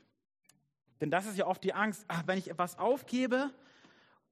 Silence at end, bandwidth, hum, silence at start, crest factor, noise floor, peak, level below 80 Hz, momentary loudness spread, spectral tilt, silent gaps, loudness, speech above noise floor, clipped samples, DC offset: 0.8 s; 14 kHz; none; 1 s; 20 dB; -64 dBFS; -14 dBFS; -82 dBFS; 5 LU; -5.5 dB/octave; none; -34 LUFS; 31 dB; under 0.1%; under 0.1%